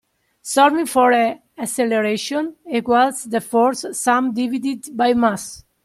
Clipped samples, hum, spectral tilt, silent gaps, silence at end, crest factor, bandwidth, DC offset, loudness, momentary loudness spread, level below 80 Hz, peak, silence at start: under 0.1%; none; -3.5 dB/octave; none; 0.25 s; 16 dB; 15 kHz; under 0.1%; -18 LUFS; 10 LU; -60 dBFS; -2 dBFS; 0.45 s